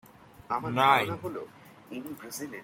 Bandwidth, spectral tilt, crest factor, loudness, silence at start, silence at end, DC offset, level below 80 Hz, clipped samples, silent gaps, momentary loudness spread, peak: 16.5 kHz; -4.5 dB/octave; 24 dB; -28 LUFS; 0.5 s; 0 s; under 0.1%; -68 dBFS; under 0.1%; none; 19 LU; -8 dBFS